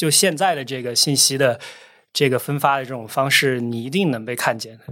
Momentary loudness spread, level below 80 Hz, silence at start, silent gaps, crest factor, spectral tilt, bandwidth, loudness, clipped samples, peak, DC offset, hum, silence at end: 11 LU; -72 dBFS; 0 s; none; 18 dB; -3 dB/octave; 17 kHz; -19 LUFS; under 0.1%; -2 dBFS; under 0.1%; none; 0 s